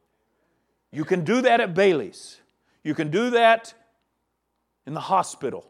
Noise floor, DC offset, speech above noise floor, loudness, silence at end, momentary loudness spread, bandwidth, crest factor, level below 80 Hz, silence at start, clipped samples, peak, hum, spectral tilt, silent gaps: -76 dBFS; under 0.1%; 54 dB; -21 LUFS; 0.1 s; 17 LU; 12.5 kHz; 20 dB; -76 dBFS; 0.95 s; under 0.1%; -4 dBFS; none; -5 dB/octave; none